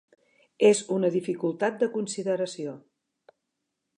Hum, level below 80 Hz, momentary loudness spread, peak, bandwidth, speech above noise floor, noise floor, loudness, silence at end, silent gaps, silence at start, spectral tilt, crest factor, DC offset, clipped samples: none; -82 dBFS; 13 LU; -8 dBFS; 11 kHz; 56 dB; -82 dBFS; -26 LUFS; 1.2 s; none; 0.6 s; -5 dB/octave; 20 dB; under 0.1%; under 0.1%